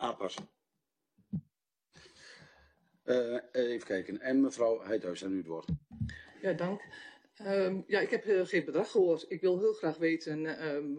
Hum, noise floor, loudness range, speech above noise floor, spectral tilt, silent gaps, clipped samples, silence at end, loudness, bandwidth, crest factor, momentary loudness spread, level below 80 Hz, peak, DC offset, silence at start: none; -86 dBFS; 7 LU; 54 dB; -6 dB/octave; none; under 0.1%; 0 s; -33 LUFS; 9.8 kHz; 18 dB; 13 LU; -64 dBFS; -16 dBFS; under 0.1%; 0 s